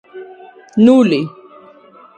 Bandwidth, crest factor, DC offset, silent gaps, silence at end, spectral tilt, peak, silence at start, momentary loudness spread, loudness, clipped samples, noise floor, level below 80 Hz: 8.8 kHz; 16 dB; under 0.1%; none; 0.9 s; -7 dB/octave; 0 dBFS; 0.15 s; 25 LU; -12 LUFS; under 0.1%; -43 dBFS; -58 dBFS